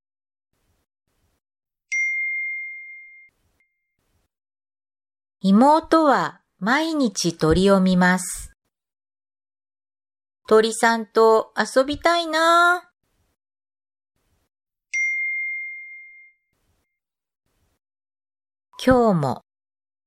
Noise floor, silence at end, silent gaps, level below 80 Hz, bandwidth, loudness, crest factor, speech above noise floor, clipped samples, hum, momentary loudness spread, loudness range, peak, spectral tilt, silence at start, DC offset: -83 dBFS; 0.7 s; none; -48 dBFS; 15.5 kHz; -19 LUFS; 20 dB; 65 dB; under 0.1%; none; 14 LU; 9 LU; -4 dBFS; -5 dB/octave; 1.9 s; under 0.1%